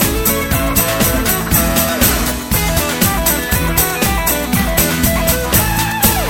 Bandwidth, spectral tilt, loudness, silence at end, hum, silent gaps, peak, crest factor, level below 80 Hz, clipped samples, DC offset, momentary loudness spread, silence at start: 17 kHz; -3.5 dB/octave; -13 LUFS; 0 s; none; none; 0 dBFS; 14 dB; -22 dBFS; under 0.1%; under 0.1%; 3 LU; 0 s